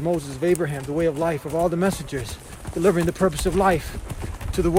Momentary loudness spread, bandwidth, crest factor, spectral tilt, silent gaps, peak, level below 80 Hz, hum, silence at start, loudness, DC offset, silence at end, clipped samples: 13 LU; 16.5 kHz; 18 dB; -6 dB/octave; none; -6 dBFS; -36 dBFS; none; 0 s; -23 LUFS; under 0.1%; 0 s; under 0.1%